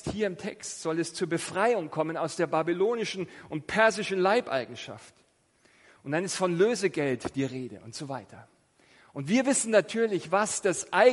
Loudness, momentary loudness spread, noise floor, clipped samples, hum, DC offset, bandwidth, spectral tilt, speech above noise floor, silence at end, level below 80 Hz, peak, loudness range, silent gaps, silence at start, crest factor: -28 LUFS; 15 LU; -65 dBFS; under 0.1%; none; under 0.1%; 11.5 kHz; -4 dB/octave; 38 dB; 0 s; -64 dBFS; -8 dBFS; 3 LU; none; 0.05 s; 22 dB